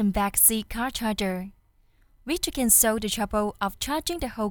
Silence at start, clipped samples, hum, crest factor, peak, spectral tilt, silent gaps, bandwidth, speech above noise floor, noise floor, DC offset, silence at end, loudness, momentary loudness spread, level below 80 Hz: 0 s; under 0.1%; none; 22 dB; -4 dBFS; -2.5 dB/octave; none; over 20 kHz; 36 dB; -61 dBFS; under 0.1%; 0 s; -23 LUFS; 13 LU; -44 dBFS